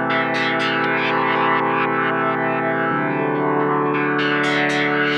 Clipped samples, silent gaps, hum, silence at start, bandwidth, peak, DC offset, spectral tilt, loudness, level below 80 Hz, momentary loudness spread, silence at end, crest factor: under 0.1%; none; none; 0 s; over 20 kHz; -6 dBFS; under 0.1%; -5.5 dB/octave; -19 LUFS; -66 dBFS; 2 LU; 0 s; 12 dB